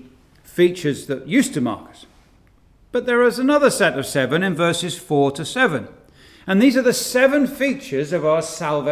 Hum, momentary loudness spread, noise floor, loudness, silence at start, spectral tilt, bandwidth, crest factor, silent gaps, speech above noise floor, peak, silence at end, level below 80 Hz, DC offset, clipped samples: none; 9 LU; -53 dBFS; -19 LUFS; 0.5 s; -4.5 dB/octave; 16 kHz; 18 dB; none; 35 dB; -2 dBFS; 0 s; -56 dBFS; under 0.1%; under 0.1%